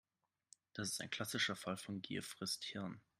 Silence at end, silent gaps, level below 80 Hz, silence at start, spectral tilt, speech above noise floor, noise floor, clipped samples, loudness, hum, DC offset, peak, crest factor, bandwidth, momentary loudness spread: 0.2 s; none; -80 dBFS; 0.75 s; -3 dB/octave; 26 dB; -71 dBFS; under 0.1%; -43 LUFS; none; under 0.1%; -24 dBFS; 20 dB; 15.5 kHz; 7 LU